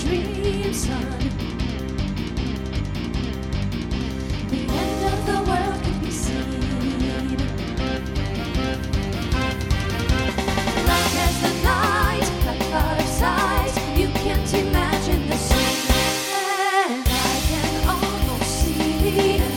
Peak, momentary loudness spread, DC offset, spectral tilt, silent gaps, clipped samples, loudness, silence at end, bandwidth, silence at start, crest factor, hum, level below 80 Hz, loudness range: -4 dBFS; 7 LU; under 0.1%; -4.5 dB/octave; none; under 0.1%; -22 LUFS; 0 s; 17.5 kHz; 0 s; 18 dB; none; -28 dBFS; 5 LU